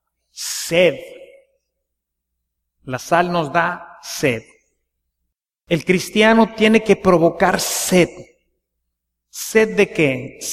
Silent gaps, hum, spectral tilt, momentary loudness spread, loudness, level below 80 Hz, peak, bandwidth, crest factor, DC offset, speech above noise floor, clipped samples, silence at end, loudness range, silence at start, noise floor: none; none; -4.5 dB/octave; 15 LU; -17 LUFS; -50 dBFS; 0 dBFS; 15.5 kHz; 18 dB; under 0.1%; 62 dB; under 0.1%; 0 s; 7 LU; 0.35 s; -78 dBFS